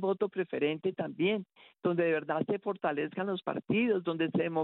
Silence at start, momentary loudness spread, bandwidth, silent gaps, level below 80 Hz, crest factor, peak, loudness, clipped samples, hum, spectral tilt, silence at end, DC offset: 0 s; 6 LU; 4.2 kHz; none; -74 dBFS; 16 dB; -16 dBFS; -32 LUFS; under 0.1%; none; -5 dB/octave; 0 s; under 0.1%